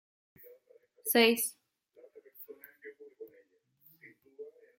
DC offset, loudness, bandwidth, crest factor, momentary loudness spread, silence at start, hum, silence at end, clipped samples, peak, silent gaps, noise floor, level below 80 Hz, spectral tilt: under 0.1%; -28 LUFS; 16.5 kHz; 26 dB; 27 LU; 1.05 s; none; 0.3 s; under 0.1%; -12 dBFS; none; -67 dBFS; -90 dBFS; -1.5 dB/octave